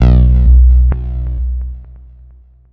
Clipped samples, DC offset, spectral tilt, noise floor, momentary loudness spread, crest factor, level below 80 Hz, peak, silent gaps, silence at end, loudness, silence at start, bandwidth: under 0.1%; under 0.1%; -10.5 dB/octave; -41 dBFS; 16 LU; 10 dB; -10 dBFS; 0 dBFS; none; 0.75 s; -12 LUFS; 0 s; 3.3 kHz